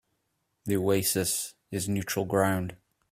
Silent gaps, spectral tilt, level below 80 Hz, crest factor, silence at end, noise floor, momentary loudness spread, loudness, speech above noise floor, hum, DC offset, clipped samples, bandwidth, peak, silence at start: none; -4.5 dB/octave; -60 dBFS; 20 dB; 0.35 s; -77 dBFS; 10 LU; -28 LUFS; 50 dB; none; under 0.1%; under 0.1%; 16 kHz; -10 dBFS; 0.65 s